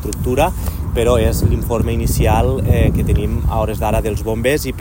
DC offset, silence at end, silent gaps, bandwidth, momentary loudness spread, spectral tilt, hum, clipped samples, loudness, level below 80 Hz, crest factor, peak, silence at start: under 0.1%; 0 s; none; 16.5 kHz; 4 LU; -6.5 dB/octave; none; under 0.1%; -17 LUFS; -22 dBFS; 14 dB; 0 dBFS; 0 s